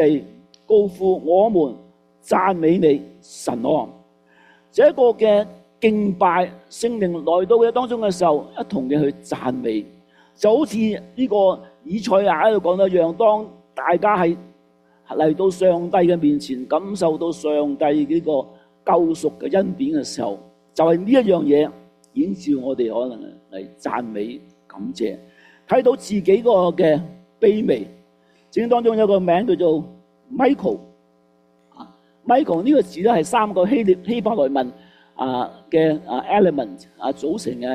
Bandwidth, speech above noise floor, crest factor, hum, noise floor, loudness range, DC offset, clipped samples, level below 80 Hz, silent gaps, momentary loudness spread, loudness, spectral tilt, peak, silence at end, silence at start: 13 kHz; 40 dB; 16 dB; none; -58 dBFS; 3 LU; under 0.1%; under 0.1%; -60 dBFS; none; 12 LU; -19 LUFS; -6.5 dB/octave; -4 dBFS; 0 s; 0 s